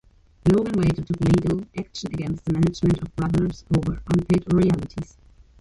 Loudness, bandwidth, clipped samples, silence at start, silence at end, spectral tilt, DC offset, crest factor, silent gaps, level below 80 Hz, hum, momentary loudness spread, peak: -23 LUFS; 11.5 kHz; under 0.1%; 0.45 s; 0.55 s; -8 dB/octave; under 0.1%; 16 dB; none; -40 dBFS; none; 11 LU; -6 dBFS